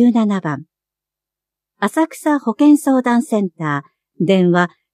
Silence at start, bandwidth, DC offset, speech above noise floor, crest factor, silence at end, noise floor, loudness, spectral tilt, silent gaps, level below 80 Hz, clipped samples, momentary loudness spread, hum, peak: 0 s; 14.5 kHz; under 0.1%; 71 dB; 14 dB; 0.25 s; -86 dBFS; -16 LUFS; -6.5 dB/octave; none; -72 dBFS; under 0.1%; 10 LU; none; -2 dBFS